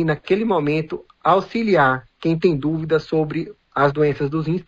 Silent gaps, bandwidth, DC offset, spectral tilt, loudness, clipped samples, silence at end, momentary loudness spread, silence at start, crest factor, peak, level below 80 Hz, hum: none; 7.6 kHz; under 0.1%; -8 dB/octave; -20 LUFS; under 0.1%; 0.05 s; 7 LU; 0 s; 16 dB; -4 dBFS; -50 dBFS; none